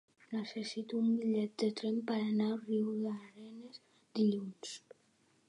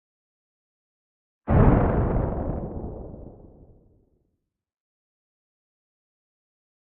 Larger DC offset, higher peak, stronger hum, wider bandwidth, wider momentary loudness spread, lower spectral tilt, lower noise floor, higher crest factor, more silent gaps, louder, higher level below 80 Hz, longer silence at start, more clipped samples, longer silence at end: neither; second, -22 dBFS vs -4 dBFS; neither; first, 10.5 kHz vs 3.6 kHz; second, 17 LU vs 21 LU; second, -6 dB/octave vs -10.5 dB/octave; second, -72 dBFS vs -77 dBFS; second, 16 dB vs 24 dB; neither; second, -36 LUFS vs -23 LUFS; second, -88 dBFS vs -34 dBFS; second, 0.3 s vs 1.45 s; neither; second, 0.7 s vs 3.7 s